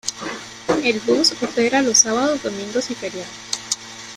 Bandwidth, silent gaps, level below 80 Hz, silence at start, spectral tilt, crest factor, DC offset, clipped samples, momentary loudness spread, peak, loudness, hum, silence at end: 15 kHz; none; -56 dBFS; 0.05 s; -1.5 dB/octave; 20 dB; under 0.1%; under 0.1%; 15 LU; -2 dBFS; -19 LUFS; none; 0 s